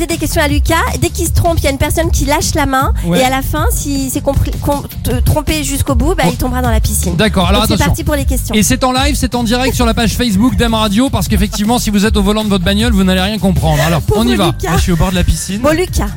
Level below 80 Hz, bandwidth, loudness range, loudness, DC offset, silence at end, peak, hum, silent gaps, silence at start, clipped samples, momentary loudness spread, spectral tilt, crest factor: -18 dBFS; 17 kHz; 2 LU; -13 LUFS; under 0.1%; 0 s; 0 dBFS; none; none; 0 s; under 0.1%; 4 LU; -5 dB/octave; 12 dB